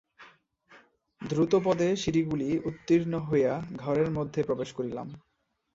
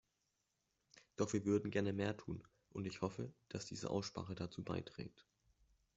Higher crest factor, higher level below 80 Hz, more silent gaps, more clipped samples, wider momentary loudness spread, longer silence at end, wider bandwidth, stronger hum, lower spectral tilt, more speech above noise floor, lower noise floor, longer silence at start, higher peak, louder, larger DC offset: about the same, 18 dB vs 20 dB; first, -58 dBFS vs -72 dBFS; neither; neither; second, 10 LU vs 14 LU; second, 0.55 s vs 0.75 s; about the same, 7.8 kHz vs 8.2 kHz; neither; about the same, -7 dB/octave vs -6 dB/octave; second, 31 dB vs 43 dB; second, -59 dBFS vs -86 dBFS; second, 0.2 s vs 0.95 s; first, -12 dBFS vs -24 dBFS; first, -28 LUFS vs -43 LUFS; neither